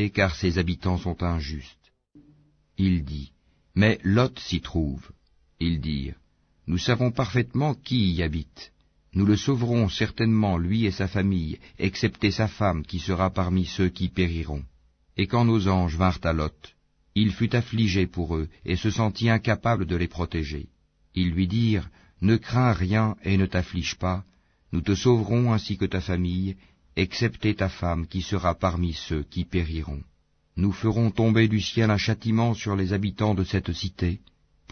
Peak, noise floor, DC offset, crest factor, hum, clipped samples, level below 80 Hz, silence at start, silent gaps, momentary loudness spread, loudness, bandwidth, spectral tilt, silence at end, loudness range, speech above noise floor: -6 dBFS; -59 dBFS; under 0.1%; 18 dB; none; under 0.1%; -40 dBFS; 0 s; none; 10 LU; -25 LUFS; 6.6 kHz; -6.5 dB/octave; 0.55 s; 3 LU; 35 dB